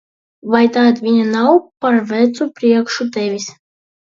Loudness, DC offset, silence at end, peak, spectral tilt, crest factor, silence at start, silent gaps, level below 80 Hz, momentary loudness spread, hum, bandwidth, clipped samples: -15 LUFS; under 0.1%; 0.65 s; 0 dBFS; -5 dB/octave; 14 dB; 0.45 s; none; -64 dBFS; 9 LU; none; 7.4 kHz; under 0.1%